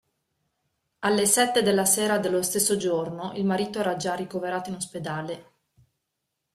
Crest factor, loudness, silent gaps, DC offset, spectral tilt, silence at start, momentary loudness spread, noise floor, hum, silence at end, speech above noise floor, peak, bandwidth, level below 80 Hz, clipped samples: 20 dB; -25 LUFS; none; under 0.1%; -3 dB/octave; 1 s; 12 LU; -81 dBFS; none; 1.1 s; 56 dB; -6 dBFS; 16 kHz; -66 dBFS; under 0.1%